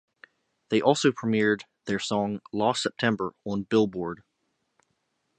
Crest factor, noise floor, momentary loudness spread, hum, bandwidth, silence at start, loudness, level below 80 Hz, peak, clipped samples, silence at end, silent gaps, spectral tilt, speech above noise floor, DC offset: 22 dB; -76 dBFS; 9 LU; none; 9.2 kHz; 0.7 s; -26 LUFS; -64 dBFS; -6 dBFS; under 0.1%; 1.25 s; none; -5 dB/octave; 51 dB; under 0.1%